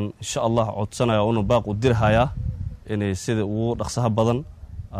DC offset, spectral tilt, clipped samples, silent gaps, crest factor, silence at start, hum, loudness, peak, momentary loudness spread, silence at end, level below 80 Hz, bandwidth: under 0.1%; -6 dB/octave; under 0.1%; none; 18 dB; 0 s; none; -23 LUFS; -6 dBFS; 10 LU; 0 s; -38 dBFS; 13 kHz